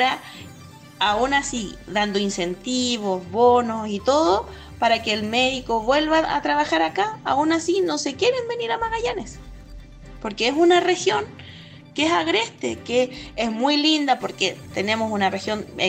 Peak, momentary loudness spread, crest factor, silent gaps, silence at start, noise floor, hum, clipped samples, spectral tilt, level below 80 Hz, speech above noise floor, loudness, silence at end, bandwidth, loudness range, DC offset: -6 dBFS; 12 LU; 16 dB; none; 0 s; -43 dBFS; none; under 0.1%; -3.5 dB/octave; -48 dBFS; 22 dB; -21 LUFS; 0 s; 15.5 kHz; 3 LU; under 0.1%